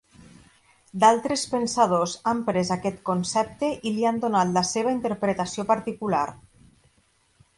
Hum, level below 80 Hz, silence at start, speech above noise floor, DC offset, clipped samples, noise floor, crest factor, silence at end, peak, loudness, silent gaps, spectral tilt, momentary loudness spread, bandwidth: none; -60 dBFS; 0.2 s; 41 dB; under 0.1%; under 0.1%; -64 dBFS; 20 dB; 1.25 s; -6 dBFS; -24 LUFS; none; -4.5 dB/octave; 7 LU; 11.5 kHz